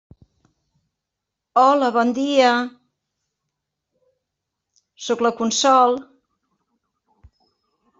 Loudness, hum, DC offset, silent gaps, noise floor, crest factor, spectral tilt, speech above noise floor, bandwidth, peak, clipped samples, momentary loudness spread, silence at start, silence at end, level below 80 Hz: -18 LUFS; none; under 0.1%; none; -82 dBFS; 20 dB; -2.5 dB/octave; 65 dB; 8 kHz; -4 dBFS; under 0.1%; 12 LU; 1.55 s; 2 s; -66 dBFS